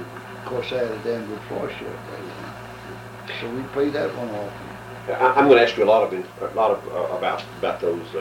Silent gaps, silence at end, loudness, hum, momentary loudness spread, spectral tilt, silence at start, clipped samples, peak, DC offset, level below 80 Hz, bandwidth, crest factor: none; 0 s; -22 LUFS; none; 19 LU; -6 dB/octave; 0 s; under 0.1%; -2 dBFS; under 0.1%; -56 dBFS; 16.5 kHz; 20 dB